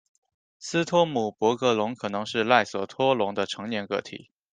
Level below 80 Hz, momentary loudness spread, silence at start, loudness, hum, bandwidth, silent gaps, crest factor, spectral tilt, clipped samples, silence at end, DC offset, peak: -70 dBFS; 10 LU; 0.6 s; -25 LUFS; none; 9.6 kHz; none; 24 dB; -4.5 dB/octave; under 0.1%; 0.35 s; under 0.1%; -2 dBFS